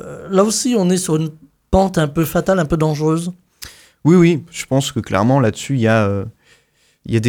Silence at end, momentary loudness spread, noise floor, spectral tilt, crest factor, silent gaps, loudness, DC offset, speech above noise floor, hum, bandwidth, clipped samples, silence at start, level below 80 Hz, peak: 0 s; 12 LU; -58 dBFS; -6 dB/octave; 16 dB; none; -16 LUFS; under 0.1%; 43 dB; none; 19 kHz; under 0.1%; 0 s; -40 dBFS; -2 dBFS